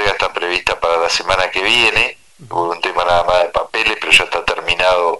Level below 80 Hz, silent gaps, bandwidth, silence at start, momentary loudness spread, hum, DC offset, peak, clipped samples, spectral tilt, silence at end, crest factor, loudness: -40 dBFS; none; 12 kHz; 0 s; 7 LU; none; 1%; 0 dBFS; under 0.1%; -2 dB/octave; 0 s; 16 dB; -14 LUFS